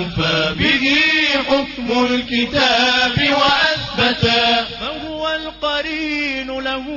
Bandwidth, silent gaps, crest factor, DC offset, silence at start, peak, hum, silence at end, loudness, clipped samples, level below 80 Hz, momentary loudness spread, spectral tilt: 6 kHz; none; 14 dB; under 0.1%; 0 s; -4 dBFS; none; 0 s; -16 LUFS; under 0.1%; -42 dBFS; 9 LU; -4 dB/octave